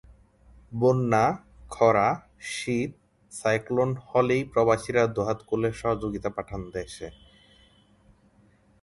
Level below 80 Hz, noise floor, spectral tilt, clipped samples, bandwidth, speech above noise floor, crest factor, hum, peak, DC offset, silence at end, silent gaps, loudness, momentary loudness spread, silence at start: -52 dBFS; -60 dBFS; -6 dB/octave; under 0.1%; 11.5 kHz; 35 dB; 20 dB; none; -6 dBFS; under 0.1%; 1.7 s; none; -26 LUFS; 15 LU; 0.1 s